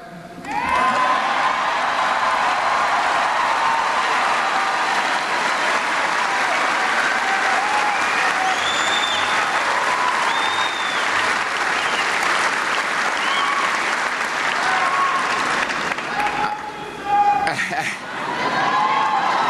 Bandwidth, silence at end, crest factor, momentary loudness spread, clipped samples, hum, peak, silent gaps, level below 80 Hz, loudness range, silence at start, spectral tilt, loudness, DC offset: 13.5 kHz; 0 s; 14 dB; 4 LU; under 0.1%; none; -6 dBFS; none; -56 dBFS; 2 LU; 0 s; -1.5 dB/octave; -19 LUFS; under 0.1%